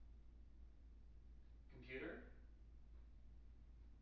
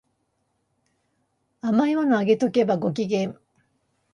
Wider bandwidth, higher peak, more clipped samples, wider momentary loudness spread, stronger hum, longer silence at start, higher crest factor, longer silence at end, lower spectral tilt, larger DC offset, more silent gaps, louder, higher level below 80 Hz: second, 6 kHz vs 11 kHz; second, -40 dBFS vs -8 dBFS; neither; first, 14 LU vs 7 LU; neither; second, 0 s vs 1.65 s; about the same, 20 dB vs 18 dB; second, 0 s vs 0.8 s; second, -5 dB/octave vs -7 dB/octave; neither; neither; second, -61 LUFS vs -23 LUFS; first, -62 dBFS vs -70 dBFS